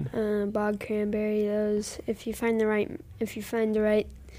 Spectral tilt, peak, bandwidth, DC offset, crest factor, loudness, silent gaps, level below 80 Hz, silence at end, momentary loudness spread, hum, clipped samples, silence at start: -6 dB/octave; -14 dBFS; 15.5 kHz; under 0.1%; 14 dB; -28 LUFS; none; -52 dBFS; 0 s; 9 LU; none; under 0.1%; 0 s